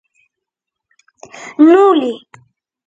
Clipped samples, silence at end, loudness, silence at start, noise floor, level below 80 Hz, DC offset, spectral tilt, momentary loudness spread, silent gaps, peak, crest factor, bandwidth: under 0.1%; 0.7 s; -11 LUFS; 1.4 s; -81 dBFS; -64 dBFS; under 0.1%; -5 dB/octave; 23 LU; none; 0 dBFS; 16 dB; 7.8 kHz